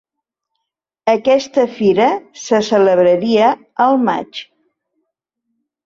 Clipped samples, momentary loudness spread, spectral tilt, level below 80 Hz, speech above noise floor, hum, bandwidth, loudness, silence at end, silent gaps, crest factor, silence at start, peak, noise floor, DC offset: under 0.1%; 10 LU; -5 dB/octave; -60 dBFS; 66 dB; none; 7.6 kHz; -14 LUFS; 1.45 s; none; 14 dB; 1.05 s; -2 dBFS; -79 dBFS; under 0.1%